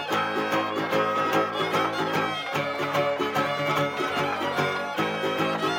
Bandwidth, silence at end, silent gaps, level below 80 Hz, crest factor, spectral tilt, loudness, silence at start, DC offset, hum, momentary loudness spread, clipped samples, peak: 17 kHz; 0 s; none; -72 dBFS; 16 dB; -4.5 dB/octave; -25 LUFS; 0 s; under 0.1%; none; 3 LU; under 0.1%; -10 dBFS